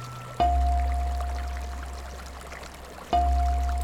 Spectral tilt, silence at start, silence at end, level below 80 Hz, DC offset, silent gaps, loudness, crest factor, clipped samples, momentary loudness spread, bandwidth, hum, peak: -6 dB/octave; 0 s; 0 s; -28 dBFS; under 0.1%; none; -28 LUFS; 16 dB; under 0.1%; 16 LU; 13 kHz; none; -12 dBFS